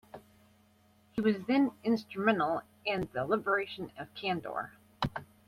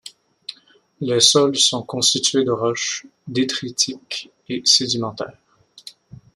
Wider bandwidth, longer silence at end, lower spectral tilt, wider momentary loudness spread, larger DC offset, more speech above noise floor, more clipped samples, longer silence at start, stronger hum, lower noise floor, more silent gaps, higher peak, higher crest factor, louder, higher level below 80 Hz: first, 15 kHz vs 13.5 kHz; second, 0.25 s vs 0.45 s; first, -7 dB/octave vs -2.5 dB/octave; second, 13 LU vs 18 LU; neither; about the same, 34 dB vs 34 dB; neither; about the same, 0.15 s vs 0.05 s; neither; first, -65 dBFS vs -53 dBFS; neither; second, -12 dBFS vs 0 dBFS; about the same, 20 dB vs 22 dB; second, -33 LUFS vs -18 LUFS; about the same, -62 dBFS vs -64 dBFS